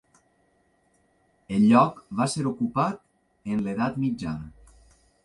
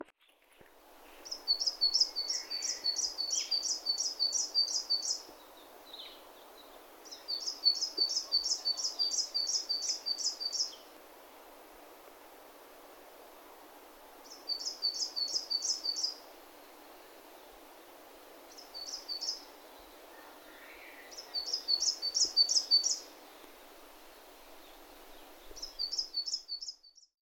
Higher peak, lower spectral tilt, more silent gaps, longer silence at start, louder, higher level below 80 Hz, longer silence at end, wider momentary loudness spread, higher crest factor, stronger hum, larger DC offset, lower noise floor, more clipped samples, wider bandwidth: first, -6 dBFS vs -14 dBFS; first, -6.5 dB/octave vs 2.5 dB/octave; neither; first, 1.5 s vs 0 s; first, -25 LUFS vs -31 LUFS; first, -56 dBFS vs -70 dBFS; first, 0.75 s vs 0.35 s; second, 18 LU vs 25 LU; about the same, 22 dB vs 24 dB; neither; neither; about the same, -67 dBFS vs -66 dBFS; neither; second, 11.5 kHz vs 18 kHz